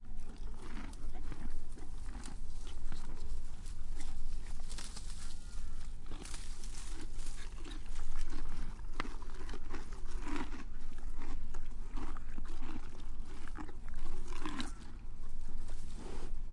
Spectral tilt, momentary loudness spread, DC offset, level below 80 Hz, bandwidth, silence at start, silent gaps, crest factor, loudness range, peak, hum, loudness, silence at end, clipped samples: -4.5 dB/octave; 5 LU; under 0.1%; -38 dBFS; 10.5 kHz; 0 s; none; 12 dB; 2 LU; -18 dBFS; none; -48 LUFS; 0 s; under 0.1%